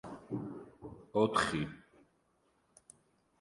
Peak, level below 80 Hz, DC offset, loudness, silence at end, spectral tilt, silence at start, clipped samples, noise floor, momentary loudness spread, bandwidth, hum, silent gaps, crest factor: -16 dBFS; -64 dBFS; under 0.1%; -35 LUFS; 1.6 s; -5 dB/octave; 0.05 s; under 0.1%; -74 dBFS; 21 LU; 11.5 kHz; none; none; 22 dB